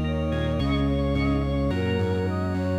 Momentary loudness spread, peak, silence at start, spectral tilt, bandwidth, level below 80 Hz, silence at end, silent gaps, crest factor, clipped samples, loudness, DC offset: 2 LU; -14 dBFS; 0 s; -8 dB/octave; 11 kHz; -32 dBFS; 0 s; none; 10 dB; under 0.1%; -25 LUFS; under 0.1%